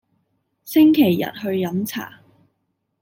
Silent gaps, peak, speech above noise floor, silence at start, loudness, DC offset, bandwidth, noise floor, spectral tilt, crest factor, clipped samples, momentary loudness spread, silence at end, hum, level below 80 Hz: none; -4 dBFS; 55 dB; 0.65 s; -18 LUFS; under 0.1%; 17 kHz; -73 dBFS; -6 dB/octave; 16 dB; under 0.1%; 15 LU; 0.95 s; none; -66 dBFS